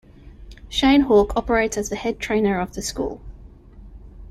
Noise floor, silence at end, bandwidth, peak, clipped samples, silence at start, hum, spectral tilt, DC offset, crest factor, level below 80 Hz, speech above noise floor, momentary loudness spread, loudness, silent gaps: -43 dBFS; 0 s; 14 kHz; -4 dBFS; under 0.1%; 0.25 s; none; -4.5 dB/octave; under 0.1%; 18 dB; -38 dBFS; 23 dB; 12 LU; -20 LUFS; none